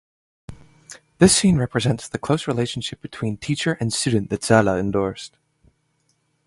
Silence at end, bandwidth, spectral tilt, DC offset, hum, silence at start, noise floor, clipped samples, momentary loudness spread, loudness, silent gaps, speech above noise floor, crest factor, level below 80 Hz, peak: 1.2 s; 11.5 kHz; -4.5 dB/octave; under 0.1%; none; 0.5 s; -67 dBFS; under 0.1%; 13 LU; -21 LUFS; none; 47 dB; 22 dB; -46 dBFS; 0 dBFS